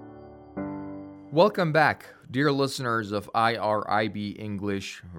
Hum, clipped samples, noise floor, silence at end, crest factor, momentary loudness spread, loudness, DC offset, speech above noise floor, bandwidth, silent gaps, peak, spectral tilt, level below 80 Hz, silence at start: none; under 0.1%; -46 dBFS; 0 s; 20 dB; 15 LU; -26 LUFS; under 0.1%; 20 dB; 17 kHz; none; -6 dBFS; -5.5 dB/octave; -66 dBFS; 0 s